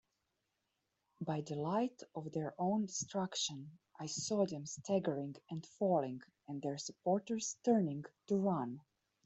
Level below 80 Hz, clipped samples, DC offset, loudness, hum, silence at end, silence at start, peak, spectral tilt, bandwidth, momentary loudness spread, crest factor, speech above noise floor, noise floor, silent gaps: -80 dBFS; under 0.1%; under 0.1%; -39 LUFS; none; 0.45 s; 1.2 s; -20 dBFS; -5 dB/octave; 8.2 kHz; 13 LU; 20 dB; 48 dB; -86 dBFS; none